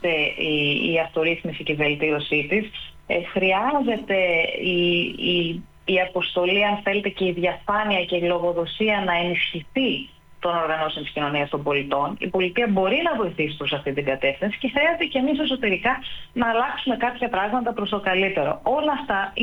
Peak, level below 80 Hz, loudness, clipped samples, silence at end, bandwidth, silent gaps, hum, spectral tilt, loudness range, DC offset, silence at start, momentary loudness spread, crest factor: -8 dBFS; -52 dBFS; -22 LUFS; under 0.1%; 0 s; 19 kHz; none; none; -7 dB/octave; 2 LU; under 0.1%; 0 s; 5 LU; 14 dB